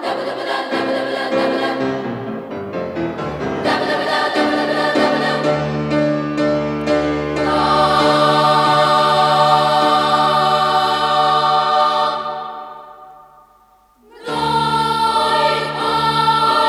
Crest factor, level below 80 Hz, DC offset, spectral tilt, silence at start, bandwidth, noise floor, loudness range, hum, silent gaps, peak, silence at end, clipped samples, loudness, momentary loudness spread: 14 dB; -48 dBFS; under 0.1%; -5 dB/octave; 0 s; 14.5 kHz; -52 dBFS; 7 LU; none; none; -2 dBFS; 0 s; under 0.1%; -16 LUFS; 11 LU